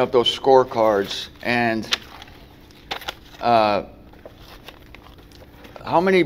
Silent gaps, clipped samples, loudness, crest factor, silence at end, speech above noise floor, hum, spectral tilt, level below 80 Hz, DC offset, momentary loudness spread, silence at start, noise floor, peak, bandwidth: none; under 0.1%; -20 LUFS; 20 dB; 0 s; 27 dB; none; -4.5 dB/octave; -50 dBFS; under 0.1%; 25 LU; 0 s; -45 dBFS; -2 dBFS; 16 kHz